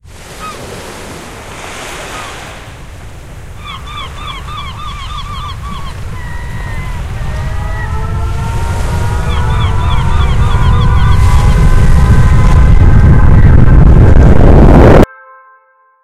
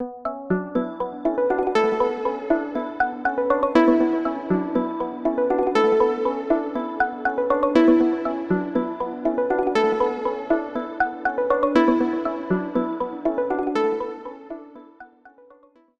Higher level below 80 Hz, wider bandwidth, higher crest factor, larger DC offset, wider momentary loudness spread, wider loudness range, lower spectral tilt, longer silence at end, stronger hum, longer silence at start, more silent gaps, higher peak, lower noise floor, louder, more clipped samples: first, -12 dBFS vs -54 dBFS; first, 12.5 kHz vs 8 kHz; second, 8 dB vs 18 dB; neither; first, 20 LU vs 9 LU; first, 18 LU vs 3 LU; about the same, -7 dB/octave vs -7 dB/octave; first, 1 s vs 0.7 s; neither; first, 0.15 s vs 0 s; neither; first, 0 dBFS vs -4 dBFS; second, -48 dBFS vs -54 dBFS; first, -9 LUFS vs -22 LUFS; first, 4% vs under 0.1%